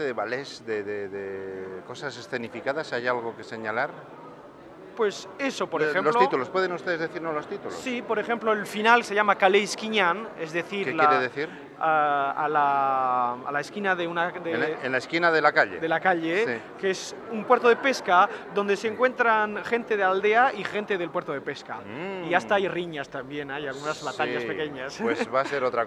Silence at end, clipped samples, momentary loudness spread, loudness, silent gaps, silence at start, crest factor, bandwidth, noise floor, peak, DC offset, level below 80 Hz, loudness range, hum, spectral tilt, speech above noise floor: 0 s; under 0.1%; 13 LU; -25 LUFS; none; 0 s; 22 dB; 13 kHz; -46 dBFS; -4 dBFS; under 0.1%; -70 dBFS; 8 LU; none; -4 dB/octave; 20 dB